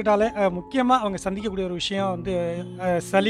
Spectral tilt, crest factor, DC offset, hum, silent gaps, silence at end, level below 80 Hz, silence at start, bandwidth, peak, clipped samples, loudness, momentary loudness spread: -5.5 dB/octave; 18 dB; under 0.1%; none; none; 0 s; -48 dBFS; 0 s; 13.5 kHz; -6 dBFS; under 0.1%; -24 LUFS; 7 LU